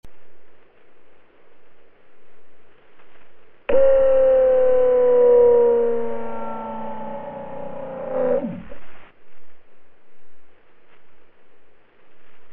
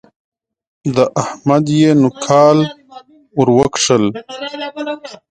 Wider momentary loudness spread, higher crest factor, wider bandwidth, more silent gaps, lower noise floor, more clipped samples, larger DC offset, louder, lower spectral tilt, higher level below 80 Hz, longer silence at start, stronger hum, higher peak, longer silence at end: first, 19 LU vs 14 LU; about the same, 16 dB vs 14 dB; second, 3.3 kHz vs 9.4 kHz; neither; first, -49 dBFS vs -40 dBFS; neither; neither; second, -18 LUFS vs -14 LUFS; first, -9.5 dB/octave vs -5.5 dB/octave; about the same, -50 dBFS vs -52 dBFS; second, 0.05 s vs 0.85 s; neither; second, -4 dBFS vs 0 dBFS; second, 0 s vs 0.15 s